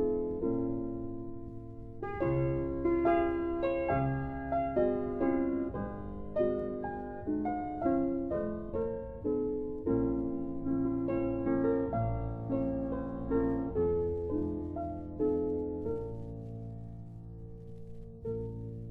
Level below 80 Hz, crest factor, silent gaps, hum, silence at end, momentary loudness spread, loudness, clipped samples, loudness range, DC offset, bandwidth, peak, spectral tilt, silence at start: -48 dBFS; 16 dB; none; none; 0 s; 13 LU; -34 LUFS; under 0.1%; 5 LU; under 0.1%; 4.1 kHz; -18 dBFS; -11 dB/octave; 0 s